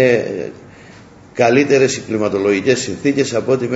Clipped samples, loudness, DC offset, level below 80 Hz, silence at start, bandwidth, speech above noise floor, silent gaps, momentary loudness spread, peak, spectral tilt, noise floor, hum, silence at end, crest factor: under 0.1%; -16 LUFS; under 0.1%; -56 dBFS; 0 s; 8 kHz; 26 dB; none; 12 LU; 0 dBFS; -5 dB/octave; -41 dBFS; none; 0 s; 16 dB